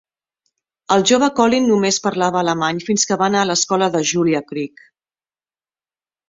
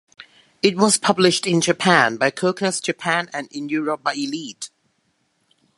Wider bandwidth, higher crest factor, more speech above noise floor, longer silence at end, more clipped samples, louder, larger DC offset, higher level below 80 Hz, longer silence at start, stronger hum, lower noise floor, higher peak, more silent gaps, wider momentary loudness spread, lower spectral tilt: second, 8 kHz vs 11.5 kHz; second, 16 dB vs 22 dB; first, over 73 dB vs 48 dB; first, 1.65 s vs 1.1 s; neither; about the same, -17 LUFS vs -19 LUFS; neither; first, -60 dBFS vs -68 dBFS; first, 0.9 s vs 0.2 s; neither; first, under -90 dBFS vs -68 dBFS; about the same, -2 dBFS vs 0 dBFS; neither; second, 6 LU vs 13 LU; about the same, -3.5 dB/octave vs -3.5 dB/octave